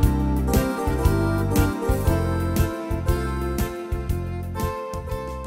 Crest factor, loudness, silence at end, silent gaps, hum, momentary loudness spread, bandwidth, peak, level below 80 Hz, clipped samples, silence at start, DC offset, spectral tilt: 18 dB; -24 LUFS; 0 s; none; none; 8 LU; 16.5 kHz; -4 dBFS; -28 dBFS; under 0.1%; 0 s; under 0.1%; -6.5 dB/octave